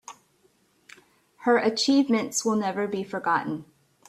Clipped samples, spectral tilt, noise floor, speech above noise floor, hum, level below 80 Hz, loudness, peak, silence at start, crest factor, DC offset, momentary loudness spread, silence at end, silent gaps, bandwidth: under 0.1%; -3.5 dB/octave; -65 dBFS; 41 dB; none; -72 dBFS; -25 LUFS; -10 dBFS; 0.1 s; 16 dB; under 0.1%; 11 LU; 0.45 s; none; 14 kHz